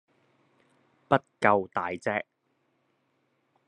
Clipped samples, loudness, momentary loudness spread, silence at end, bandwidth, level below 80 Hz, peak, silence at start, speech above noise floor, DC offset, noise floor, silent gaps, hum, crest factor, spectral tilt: under 0.1%; -27 LUFS; 9 LU; 1.45 s; 10.5 kHz; -70 dBFS; -4 dBFS; 1.1 s; 47 dB; under 0.1%; -74 dBFS; none; none; 28 dB; -6.5 dB/octave